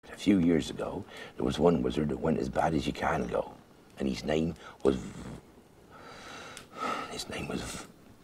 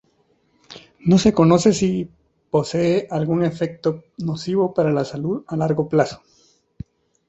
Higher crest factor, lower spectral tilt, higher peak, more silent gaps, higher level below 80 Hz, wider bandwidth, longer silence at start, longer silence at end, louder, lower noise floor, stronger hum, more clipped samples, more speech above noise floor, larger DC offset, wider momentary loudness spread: about the same, 22 dB vs 18 dB; about the same, -6 dB/octave vs -6.5 dB/octave; second, -10 dBFS vs -2 dBFS; neither; about the same, -50 dBFS vs -52 dBFS; first, 15.5 kHz vs 8.2 kHz; second, 0.05 s vs 0.7 s; second, 0.1 s vs 1.15 s; second, -31 LUFS vs -20 LUFS; second, -56 dBFS vs -63 dBFS; neither; neither; second, 25 dB vs 44 dB; neither; first, 19 LU vs 16 LU